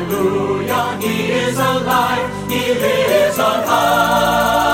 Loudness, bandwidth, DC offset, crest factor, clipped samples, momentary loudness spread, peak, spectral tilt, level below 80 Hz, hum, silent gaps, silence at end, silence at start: -15 LUFS; 16.5 kHz; under 0.1%; 14 dB; under 0.1%; 5 LU; -2 dBFS; -4 dB/octave; -42 dBFS; none; none; 0 s; 0 s